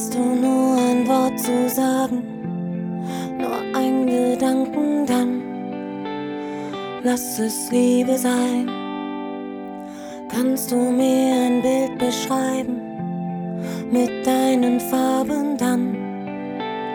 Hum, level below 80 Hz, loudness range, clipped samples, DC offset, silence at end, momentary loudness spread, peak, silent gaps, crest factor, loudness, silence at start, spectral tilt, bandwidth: none; -60 dBFS; 2 LU; under 0.1%; under 0.1%; 0 s; 11 LU; -6 dBFS; none; 16 dB; -21 LUFS; 0 s; -5 dB/octave; over 20 kHz